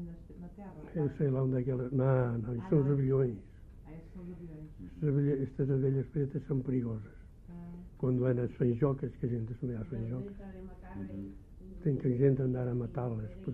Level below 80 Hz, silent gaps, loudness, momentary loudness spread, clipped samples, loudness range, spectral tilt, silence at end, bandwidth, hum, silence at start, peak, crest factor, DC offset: -52 dBFS; none; -33 LUFS; 19 LU; under 0.1%; 4 LU; -12 dB/octave; 0 s; 3.3 kHz; none; 0 s; -16 dBFS; 18 dB; under 0.1%